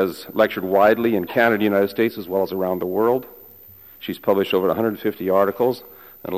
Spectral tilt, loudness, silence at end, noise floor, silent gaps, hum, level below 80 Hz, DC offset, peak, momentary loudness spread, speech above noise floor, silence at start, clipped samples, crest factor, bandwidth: -6.5 dB/octave; -20 LUFS; 0 s; -45 dBFS; none; none; -60 dBFS; 0.1%; -4 dBFS; 9 LU; 26 dB; 0 s; under 0.1%; 16 dB; 15 kHz